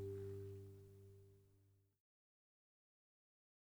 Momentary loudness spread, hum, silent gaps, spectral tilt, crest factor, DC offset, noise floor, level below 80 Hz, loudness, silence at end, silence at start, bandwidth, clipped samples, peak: 15 LU; 50 Hz at -85 dBFS; none; -8.5 dB/octave; 16 dB; under 0.1%; -76 dBFS; -80 dBFS; -55 LUFS; 1.8 s; 0 s; over 20 kHz; under 0.1%; -40 dBFS